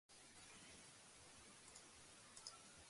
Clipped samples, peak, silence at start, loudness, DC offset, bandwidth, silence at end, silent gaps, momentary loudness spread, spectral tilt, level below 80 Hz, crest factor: under 0.1%; -38 dBFS; 0.1 s; -61 LUFS; under 0.1%; 11.5 kHz; 0 s; none; 5 LU; -1.5 dB/octave; -82 dBFS; 26 dB